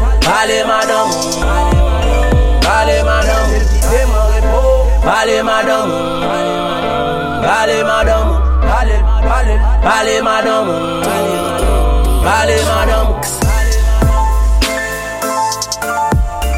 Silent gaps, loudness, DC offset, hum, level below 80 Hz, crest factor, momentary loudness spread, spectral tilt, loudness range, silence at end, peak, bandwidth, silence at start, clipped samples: none; -13 LUFS; under 0.1%; none; -14 dBFS; 12 dB; 4 LU; -4.5 dB/octave; 2 LU; 0 s; 0 dBFS; 16 kHz; 0 s; under 0.1%